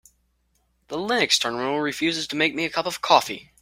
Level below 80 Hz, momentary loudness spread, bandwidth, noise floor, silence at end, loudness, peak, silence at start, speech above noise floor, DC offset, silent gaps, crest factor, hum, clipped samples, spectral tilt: -62 dBFS; 9 LU; 16 kHz; -68 dBFS; 0.2 s; -22 LUFS; -2 dBFS; 0.9 s; 45 dB; under 0.1%; none; 24 dB; none; under 0.1%; -2.5 dB/octave